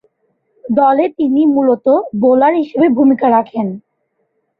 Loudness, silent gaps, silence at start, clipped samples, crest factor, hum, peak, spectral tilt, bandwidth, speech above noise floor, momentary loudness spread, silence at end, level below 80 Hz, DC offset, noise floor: -13 LUFS; none; 0.65 s; under 0.1%; 12 dB; none; -2 dBFS; -10.5 dB/octave; 4.6 kHz; 54 dB; 9 LU; 0.8 s; -60 dBFS; under 0.1%; -66 dBFS